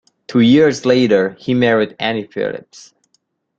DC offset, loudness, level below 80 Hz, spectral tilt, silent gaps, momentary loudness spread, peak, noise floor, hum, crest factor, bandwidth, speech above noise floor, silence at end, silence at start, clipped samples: under 0.1%; -15 LUFS; -56 dBFS; -6 dB/octave; none; 12 LU; -2 dBFS; -65 dBFS; none; 14 dB; 7.6 kHz; 50 dB; 1 s; 0.3 s; under 0.1%